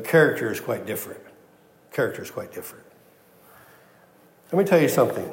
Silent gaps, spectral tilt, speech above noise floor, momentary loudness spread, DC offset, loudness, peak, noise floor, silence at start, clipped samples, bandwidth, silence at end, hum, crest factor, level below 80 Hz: none; -5.5 dB/octave; 33 dB; 19 LU; under 0.1%; -23 LUFS; -4 dBFS; -55 dBFS; 0 s; under 0.1%; 16.5 kHz; 0 s; none; 20 dB; -74 dBFS